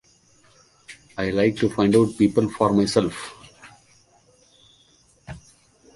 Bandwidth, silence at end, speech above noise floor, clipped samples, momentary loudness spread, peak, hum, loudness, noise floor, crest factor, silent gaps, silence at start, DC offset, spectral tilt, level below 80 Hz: 11.5 kHz; 0.6 s; 38 dB; under 0.1%; 24 LU; -4 dBFS; none; -21 LUFS; -58 dBFS; 20 dB; none; 0.9 s; under 0.1%; -6 dB/octave; -52 dBFS